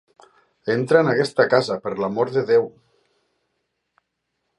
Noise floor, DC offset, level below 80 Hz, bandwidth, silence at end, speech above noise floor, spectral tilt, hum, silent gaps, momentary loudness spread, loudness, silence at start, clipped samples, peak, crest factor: -76 dBFS; under 0.1%; -68 dBFS; 11.5 kHz; 1.9 s; 57 dB; -6 dB/octave; none; none; 8 LU; -20 LUFS; 0.65 s; under 0.1%; -2 dBFS; 20 dB